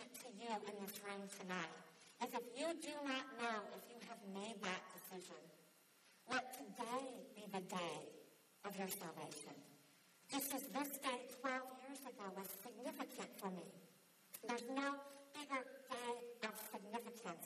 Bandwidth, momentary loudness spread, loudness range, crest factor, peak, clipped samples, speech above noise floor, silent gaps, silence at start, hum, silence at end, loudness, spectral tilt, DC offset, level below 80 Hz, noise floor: 14 kHz; 15 LU; 3 LU; 20 dB; -30 dBFS; under 0.1%; 23 dB; none; 0 s; none; 0 s; -48 LUFS; -3 dB/octave; under 0.1%; under -90 dBFS; -71 dBFS